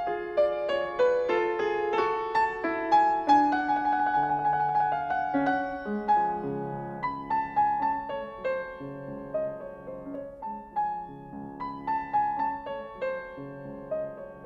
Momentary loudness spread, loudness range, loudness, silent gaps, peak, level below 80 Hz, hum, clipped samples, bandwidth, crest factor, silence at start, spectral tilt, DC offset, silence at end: 15 LU; 9 LU; -28 LUFS; none; -12 dBFS; -58 dBFS; none; under 0.1%; 7.6 kHz; 16 dB; 0 s; -6.5 dB/octave; under 0.1%; 0 s